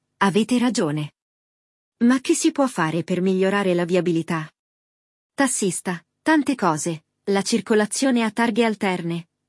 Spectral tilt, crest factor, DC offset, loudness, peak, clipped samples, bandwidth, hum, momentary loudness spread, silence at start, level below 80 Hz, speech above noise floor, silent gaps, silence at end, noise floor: -4.5 dB/octave; 18 dB; under 0.1%; -21 LUFS; -4 dBFS; under 0.1%; 12 kHz; none; 9 LU; 0.2 s; -70 dBFS; over 69 dB; 1.22-1.92 s, 4.59-5.30 s; 0.25 s; under -90 dBFS